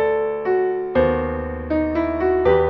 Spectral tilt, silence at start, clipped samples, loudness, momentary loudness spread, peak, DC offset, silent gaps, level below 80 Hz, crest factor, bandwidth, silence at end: -9.5 dB/octave; 0 s; under 0.1%; -21 LUFS; 5 LU; -4 dBFS; under 0.1%; none; -36 dBFS; 16 dB; 5.4 kHz; 0 s